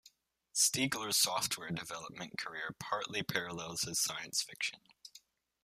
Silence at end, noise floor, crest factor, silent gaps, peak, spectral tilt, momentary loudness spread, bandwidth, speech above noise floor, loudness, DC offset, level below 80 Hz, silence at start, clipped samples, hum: 0.45 s; -67 dBFS; 22 dB; none; -16 dBFS; -1.5 dB/octave; 14 LU; 15.5 kHz; 30 dB; -35 LUFS; under 0.1%; -72 dBFS; 0.05 s; under 0.1%; none